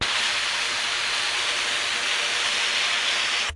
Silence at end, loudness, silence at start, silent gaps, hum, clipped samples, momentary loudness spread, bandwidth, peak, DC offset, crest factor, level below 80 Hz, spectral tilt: 0 s; -22 LUFS; 0 s; none; none; under 0.1%; 2 LU; 11.5 kHz; -12 dBFS; under 0.1%; 14 dB; -54 dBFS; 1 dB/octave